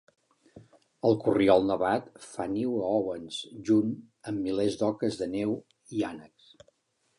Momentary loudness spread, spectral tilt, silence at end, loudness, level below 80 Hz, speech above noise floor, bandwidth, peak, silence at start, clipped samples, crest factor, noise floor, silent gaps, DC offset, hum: 14 LU; -6.5 dB/octave; 0.95 s; -29 LUFS; -62 dBFS; 41 dB; 11 kHz; -8 dBFS; 0.55 s; under 0.1%; 22 dB; -69 dBFS; none; under 0.1%; none